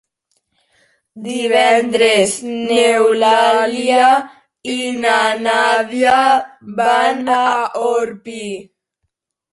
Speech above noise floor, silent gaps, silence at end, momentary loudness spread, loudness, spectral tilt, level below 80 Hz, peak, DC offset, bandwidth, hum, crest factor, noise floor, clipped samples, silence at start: 59 dB; none; 0.9 s; 15 LU; -14 LUFS; -2.5 dB/octave; -62 dBFS; -2 dBFS; under 0.1%; 11.5 kHz; none; 14 dB; -73 dBFS; under 0.1%; 1.15 s